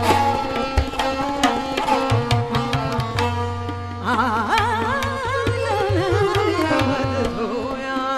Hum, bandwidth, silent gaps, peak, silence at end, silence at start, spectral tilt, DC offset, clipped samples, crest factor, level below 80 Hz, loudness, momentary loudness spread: none; 14 kHz; none; 0 dBFS; 0 s; 0 s; -5.5 dB/octave; under 0.1%; under 0.1%; 20 dB; -36 dBFS; -21 LUFS; 6 LU